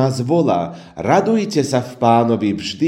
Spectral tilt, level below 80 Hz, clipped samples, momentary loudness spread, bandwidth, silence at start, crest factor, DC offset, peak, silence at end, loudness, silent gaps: -6.5 dB/octave; -54 dBFS; under 0.1%; 6 LU; 14 kHz; 0 s; 16 dB; under 0.1%; 0 dBFS; 0 s; -17 LUFS; none